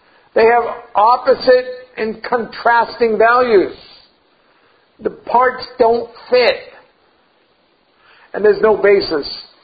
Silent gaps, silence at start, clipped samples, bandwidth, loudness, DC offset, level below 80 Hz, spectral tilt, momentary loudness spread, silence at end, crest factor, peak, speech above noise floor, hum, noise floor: none; 0.35 s; under 0.1%; 5 kHz; -14 LUFS; under 0.1%; -52 dBFS; -7.5 dB/octave; 12 LU; 0.2 s; 16 dB; 0 dBFS; 43 dB; none; -57 dBFS